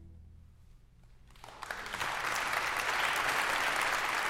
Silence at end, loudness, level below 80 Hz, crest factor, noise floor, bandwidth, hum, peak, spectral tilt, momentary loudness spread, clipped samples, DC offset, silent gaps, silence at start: 0 s; -32 LUFS; -58 dBFS; 18 dB; -58 dBFS; 16.5 kHz; none; -16 dBFS; -1 dB/octave; 12 LU; under 0.1%; under 0.1%; none; 0 s